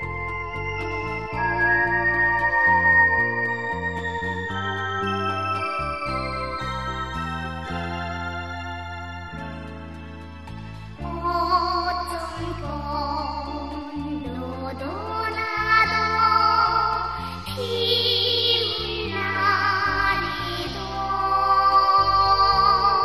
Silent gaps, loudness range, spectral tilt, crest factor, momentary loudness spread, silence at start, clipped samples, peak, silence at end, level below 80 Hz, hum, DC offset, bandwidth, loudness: none; 10 LU; -4.5 dB/octave; 18 dB; 15 LU; 0 s; under 0.1%; -6 dBFS; 0 s; -40 dBFS; none; 0.4%; 13.5 kHz; -22 LUFS